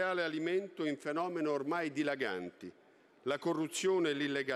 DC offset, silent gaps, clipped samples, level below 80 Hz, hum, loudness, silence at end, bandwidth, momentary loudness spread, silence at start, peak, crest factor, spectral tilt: under 0.1%; none; under 0.1%; -86 dBFS; none; -35 LUFS; 0 s; 13.5 kHz; 10 LU; 0 s; -22 dBFS; 14 dB; -4.5 dB/octave